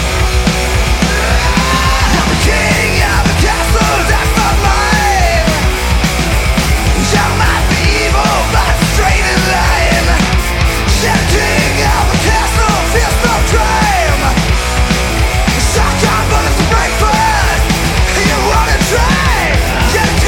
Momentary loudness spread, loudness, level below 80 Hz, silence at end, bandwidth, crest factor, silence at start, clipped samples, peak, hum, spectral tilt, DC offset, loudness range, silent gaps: 2 LU; -11 LUFS; -14 dBFS; 0 s; 17 kHz; 10 dB; 0 s; under 0.1%; 0 dBFS; none; -4 dB/octave; under 0.1%; 1 LU; none